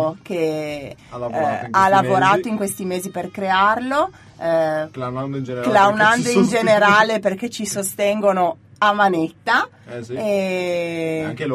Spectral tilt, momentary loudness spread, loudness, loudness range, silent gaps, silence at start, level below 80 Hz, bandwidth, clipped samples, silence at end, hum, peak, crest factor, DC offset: -4.5 dB/octave; 12 LU; -19 LUFS; 4 LU; none; 0 s; -58 dBFS; 15.5 kHz; under 0.1%; 0 s; none; 0 dBFS; 18 dB; under 0.1%